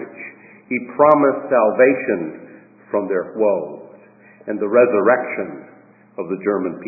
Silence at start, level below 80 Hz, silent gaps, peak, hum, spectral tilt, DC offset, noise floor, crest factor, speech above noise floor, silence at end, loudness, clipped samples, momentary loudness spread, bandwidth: 0 s; -68 dBFS; none; 0 dBFS; none; -11 dB/octave; under 0.1%; -47 dBFS; 18 dB; 30 dB; 0 s; -18 LUFS; under 0.1%; 22 LU; 2.7 kHz